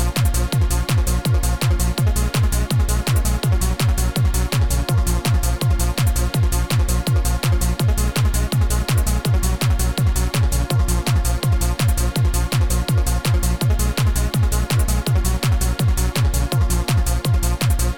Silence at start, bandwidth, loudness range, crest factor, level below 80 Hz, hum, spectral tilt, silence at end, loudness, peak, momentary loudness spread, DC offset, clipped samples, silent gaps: 0 s; 19 kHz; 0 LU; 12 dB; -20 dBFS; none; -5 dB/octave; 0 s; -19 LUFS; -6 dBFS; 1 LU; 0.9%; under 0.1%; none